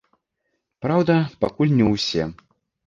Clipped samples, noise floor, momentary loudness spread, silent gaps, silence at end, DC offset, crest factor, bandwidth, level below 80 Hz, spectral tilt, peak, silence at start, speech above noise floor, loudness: under 0.1%; -75 dBFS; 9 LU; none; 0.55 s; under 0.1%; 18 dB; 7.4 kHz; -50 dBFS; -6.5 dB/octave; -4 dBFS; 0.8 s; 56 dB; -21 LUFS